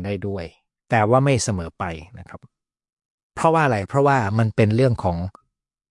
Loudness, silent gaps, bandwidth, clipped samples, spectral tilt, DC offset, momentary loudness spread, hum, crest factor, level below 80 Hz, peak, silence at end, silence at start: -20 LUFS; 2.93-2.97 s, 3.05-3.30 s; 11.5 kHz; under 0.1%; -6.5 dB/octave; under 0.1%; 18 LU; none; 18 dB; -52 dBFS; -4 dBFS; 0.6 s; 0 s